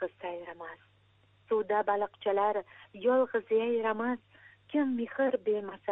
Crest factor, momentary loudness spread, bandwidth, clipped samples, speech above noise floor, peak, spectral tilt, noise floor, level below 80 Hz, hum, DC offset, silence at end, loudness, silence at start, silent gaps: 16 dB; 12 LU; 4 kHz; under 0.1%; 35 dB; -16 dBFS; -8.5 dB/octave; -65 dBFS; -78 dBFS; none; under 0.1%; 0 s; -31 LUFS; 0 s; none